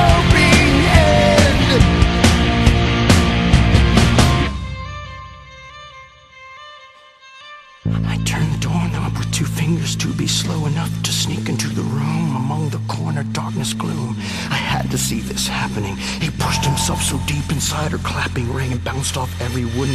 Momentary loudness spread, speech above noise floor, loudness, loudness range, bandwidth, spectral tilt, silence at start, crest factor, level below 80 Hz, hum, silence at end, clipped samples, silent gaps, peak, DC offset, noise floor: 15 LU; 23 dB; -17 LUFS; 11 LU; 15 kHz; -5 dB/octave; 0 s; 16 dB; -24 dBFS; none; 0 s; under 0.1%; none; 0 dBFS; under 0.1%; -44 dBFS